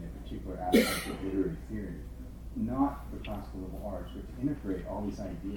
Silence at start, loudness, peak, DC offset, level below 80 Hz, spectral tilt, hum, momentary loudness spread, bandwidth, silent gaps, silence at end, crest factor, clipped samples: 0 s; -34 LUFS; -12 dBFS; under 0.1%; -44 dBFS; -5.5 dB/octave; none; 15 LU; 19.5 kHz; none; 0 s; 22 dB; under 0.1%